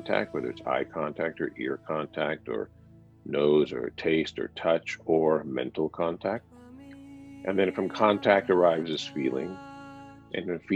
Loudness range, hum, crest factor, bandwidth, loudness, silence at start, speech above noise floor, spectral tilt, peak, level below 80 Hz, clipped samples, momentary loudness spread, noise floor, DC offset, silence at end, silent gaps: 3 LU; none; 22 dB; 8.2 kHz; -28 LUFS; 0 s; 20 dB; -6 dB/octave; -6 dBFS; -64 dBFS; under 0.1%; 20 LU; -47 dBFS; under 0.1%; 0 s; none